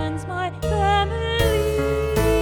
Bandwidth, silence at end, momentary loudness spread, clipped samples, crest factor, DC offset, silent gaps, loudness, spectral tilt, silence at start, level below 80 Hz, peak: 18 kHz; 0 s; 7 LU; under 0.1%; 14 dB; under 0.1%; none; -22 LUFS; -5.5 dB/octave; 0 s; -28 dBFS; -6 dBFS